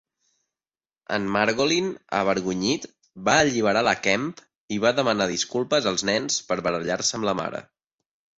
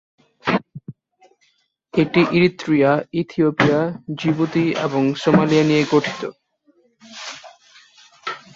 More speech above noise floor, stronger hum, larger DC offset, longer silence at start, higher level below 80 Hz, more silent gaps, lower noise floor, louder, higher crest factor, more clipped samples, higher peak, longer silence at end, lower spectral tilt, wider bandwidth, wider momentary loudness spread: first, over 66 dB vs 47 dB; neither; neither; first, 1.1 s vs 0.45 s; about the same, -58 dBFS vs -56 dBFS; first, 4.55-4.68 s vs none; first, under -90 dBFS vs -64 dBFS; second, -23 LUFS vs -18 LUFS; about the same, 20 dB vs 18 dB; neither; second, -6 dBFS vs -2 dBFS; first, 0.75 s vs 0.2 s; second, -3 dB/octave vs -6.5 dB/octave; about the same, 8.2 kHz vs 7.8 kHz; second, 8 LU vs 17 LU